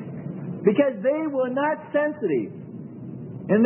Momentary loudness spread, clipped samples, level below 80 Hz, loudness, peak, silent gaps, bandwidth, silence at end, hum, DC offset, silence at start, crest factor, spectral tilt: 16 LU; under 0.1%; -70 dBFS; -24 LUFS; -6 dBFS; none; 3.4 kHz; 0 s; none; under 0.1%; 0 s; 18 dB; -12 dB/octave